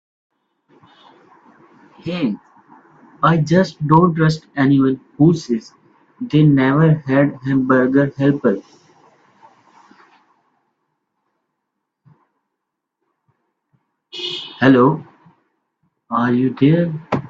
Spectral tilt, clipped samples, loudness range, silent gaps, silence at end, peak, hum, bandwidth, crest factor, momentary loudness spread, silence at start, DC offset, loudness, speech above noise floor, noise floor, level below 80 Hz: -8 dB/octave; under 0.1%; 9 LU; none; 0 s; 0 dBFS; none; 7.6 kHz; 18 dB; 12 LU; 2.05 s; under 0.1%; -16 LUFS; 64 dB; -78 dBFS; -56 dBFS